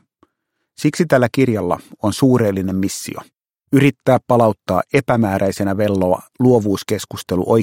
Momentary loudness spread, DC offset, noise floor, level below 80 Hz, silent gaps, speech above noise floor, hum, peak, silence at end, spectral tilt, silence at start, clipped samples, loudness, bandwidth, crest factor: 8 LU; under 0.1%; -74 dBFS; -52 dBFS; none; 58 dB; none; 0 dBFS; 0 s; -6.5 dB/octave; 0.8 s; under 0.1%; -17 LUFS; 17 kHz; 16 dB